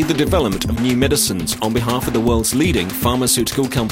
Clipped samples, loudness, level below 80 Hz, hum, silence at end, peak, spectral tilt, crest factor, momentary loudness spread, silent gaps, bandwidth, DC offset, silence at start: under 0.1%; -17 LUFS; -30 dBFS; none; 0 s; -2 dBFS; -4.5 dB/octave; 14 dB; 4 LU; none; 16.5 kHz; 0.1%; 0 s